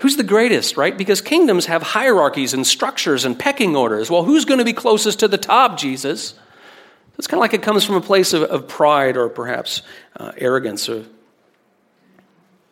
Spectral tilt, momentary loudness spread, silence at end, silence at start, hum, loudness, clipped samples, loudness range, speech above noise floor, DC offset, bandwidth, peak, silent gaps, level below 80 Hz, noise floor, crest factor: -3 dB/octave; 10 LU; 1.65 s; 0 s; none; -16 LUFS; under 0.1%; 5 LU; 43 dB; under 0.1%; 17 kHz; 0 dBFS; none; -68 dBFS; -60 dBFS; 16 dB